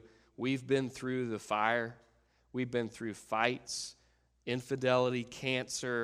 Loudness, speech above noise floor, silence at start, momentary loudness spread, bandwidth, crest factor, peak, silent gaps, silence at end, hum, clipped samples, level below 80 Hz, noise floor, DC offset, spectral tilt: -34 LUFS; 33 dB; 0.05 s; 9 LU; 15 kHz; 24 dB; -12 dBFS; none; 0 s; none; under 0.1%; -70 dBFS; -67 dBFS; under 0.1%; -4.5 dB/octave